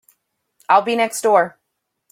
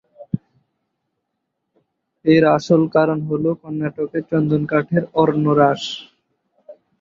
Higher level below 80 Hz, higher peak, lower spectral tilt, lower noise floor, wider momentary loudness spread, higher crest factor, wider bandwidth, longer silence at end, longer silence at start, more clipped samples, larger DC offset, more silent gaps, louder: second, -72 dBFS vs -58 dBFS; about the same, -2 dBFS vs 0 dBFS; second, -3 dB/octave vs -7.5 dB/octave; about the same, -75 dBFS vs -76 dBFS; second, 4 LU vs 14 LU; about the same, 18 dB vs 18 dB; first, 16.5 kHz vs 7.6 kHz; first, 0.65 s vs 0.3 s; first, 0.7 s vs 0.2 s; neither; neither; neither; about the same, -17 LUFS vs -18 LUFS